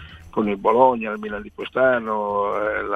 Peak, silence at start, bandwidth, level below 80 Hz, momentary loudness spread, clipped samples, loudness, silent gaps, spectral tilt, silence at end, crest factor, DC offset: -2 dBFS; 0 s; 6.4 kHz; -50 dBFS; 13 LU; under 0.1%; -21 LUFS; none; -7.5 dB/octave; 0 s; 20 dB; under 0.1%